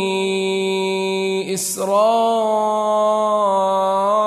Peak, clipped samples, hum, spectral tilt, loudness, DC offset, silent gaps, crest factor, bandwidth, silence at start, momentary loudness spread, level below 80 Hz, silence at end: -6 dBFS; under 0.1%; none; -4 dB/octave; -18 LUFS; under 0.1%; none; 12 dB; 13.5 kHz; 0 s; 5 LU; -70 dBFS; 0 s